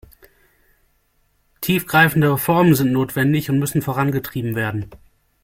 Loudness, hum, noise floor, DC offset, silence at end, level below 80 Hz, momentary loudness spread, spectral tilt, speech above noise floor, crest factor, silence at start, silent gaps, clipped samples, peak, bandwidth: -18 LUFS; none; -63 dBFS; under 0.1%; 0.5 s; -50 dBFS; 10 LU; -6 dB/octave; 45 dB; 20 dB; 1.6 s; none; under 0.1%; 0 dBFS; 16.5 kHz